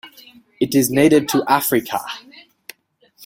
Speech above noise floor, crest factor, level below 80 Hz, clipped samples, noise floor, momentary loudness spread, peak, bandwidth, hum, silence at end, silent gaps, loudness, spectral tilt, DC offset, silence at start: 41 dB; 18 dB; -56 dBFS; under 0.1%; -57 dBFS; 18 LU; -2 dBFS; 16.5 kHz; none; 1.05 s; none; -17 LUFS; -4.5 dB/octave; under 0.1%; 0.05 s